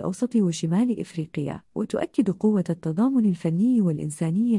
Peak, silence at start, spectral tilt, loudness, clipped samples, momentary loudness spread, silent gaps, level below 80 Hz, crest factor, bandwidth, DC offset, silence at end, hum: -10 dBFS; 0 s; -7.5 dB/octave; -24 LUFS; under 0.1%; 9 LU; none; -62 dBFS; 14 dB; 11.5 kHz; under 0.1%; 0 s; none